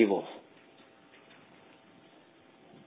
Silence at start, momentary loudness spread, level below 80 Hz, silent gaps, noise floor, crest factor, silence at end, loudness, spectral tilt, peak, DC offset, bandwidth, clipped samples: 0 s; 22 LU; -84 dBFS; none; -59 dBFS; 24 dB; 2.5 s; -32 LUFS; -5 dB/octave; -12 dBFS; under 0.1%; 4 kHz; under 0.1%